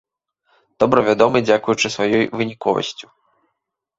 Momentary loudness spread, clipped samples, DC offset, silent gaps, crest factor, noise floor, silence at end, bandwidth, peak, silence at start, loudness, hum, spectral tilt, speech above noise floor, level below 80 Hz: 8 LU; under 0.1%; under 0.1%; none; 18 dB; -76 dBFS; 0.95 s; 8 kHz; 0 dBFS; 0.8 s; -18 LUFS; none; -4.5 dB/octave; 59 dB; -56 dBFS